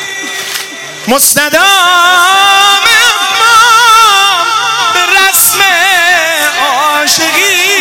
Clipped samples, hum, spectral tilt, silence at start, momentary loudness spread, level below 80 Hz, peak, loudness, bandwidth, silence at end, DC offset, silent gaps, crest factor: 0.7%; none; 0.5 dB/octave; 0 s; 10 LU; -50 dBFS; 0 dBFS; -5 LUFS; over 20 kHz; 0 s; under 0.1%; none; 8 dB